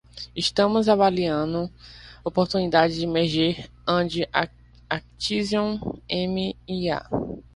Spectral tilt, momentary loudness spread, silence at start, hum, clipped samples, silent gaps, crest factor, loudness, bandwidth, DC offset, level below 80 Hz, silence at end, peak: -5.5 dB/octave; 11 LU; 0.15 s; 60 Hz at -45 dBFS; under 0.1%; none; 22 dB; -24 LUFS; 11.5 kHz; under 0.1%; -50 dBFS; 0.15 s; -4 dBFS